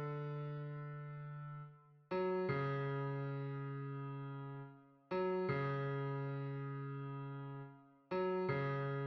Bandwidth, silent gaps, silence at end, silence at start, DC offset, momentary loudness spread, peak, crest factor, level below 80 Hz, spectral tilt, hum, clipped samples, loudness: 5.6 kHz; none; 0 s; 0 s; under 0.1%; 12 LU; -26 dBFS; 16 dB; -76 dBFS; -9.5 dB/octave; none; under 0.1%; -42 LUFS